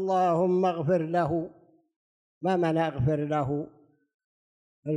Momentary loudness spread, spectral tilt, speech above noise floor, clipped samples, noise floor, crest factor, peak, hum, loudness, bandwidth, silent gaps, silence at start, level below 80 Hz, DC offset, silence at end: 10 LU; -8.5 dB/octave; over 64 dB; under 0.1%; under -90 dBFS; 14 dB; -14 dBFS; none; -27 LUFS; 10 kHz; 1.96-2.41 s, 4.14-4.83 s; 0 s; -58 dBFS; under 0.1%; 0 s